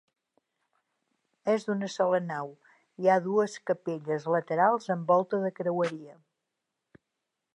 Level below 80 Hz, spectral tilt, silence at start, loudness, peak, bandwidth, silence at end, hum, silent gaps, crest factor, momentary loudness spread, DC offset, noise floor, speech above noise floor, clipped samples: -86 dBFS; -6.5 dB/octave; 1.45 s; -28 LUFS; -12 dBFS; 10.5 kHz; 1.45 s; none; none; 20 dB; 9 LU; under 0.1%; -85 dBFS; 57 dB; under 0.1%